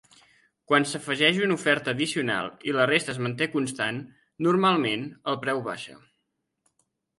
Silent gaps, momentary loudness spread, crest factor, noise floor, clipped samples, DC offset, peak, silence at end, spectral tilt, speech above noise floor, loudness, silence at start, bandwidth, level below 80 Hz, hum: none; 9 LU; 20 dB; -79 dBFS; under 0.1%; under 0.1%; -6 dBFS; 1.2 s; -4.5 dB/octave; 53 dB; -25 LUFS; 0.7 s; 11.5 kHz; -70 dBFS; none